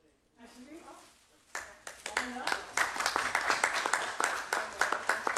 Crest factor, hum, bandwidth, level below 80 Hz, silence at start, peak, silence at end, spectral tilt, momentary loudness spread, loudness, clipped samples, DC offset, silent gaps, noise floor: 26 dB; none; 14 kHz; -68 dBFS; 0.4 s; -10 dBFS; 0 s; 0 dB/octave; 20 LU; -32 LUFS; under 0.1%; under 0.1%; none; -62 dBFS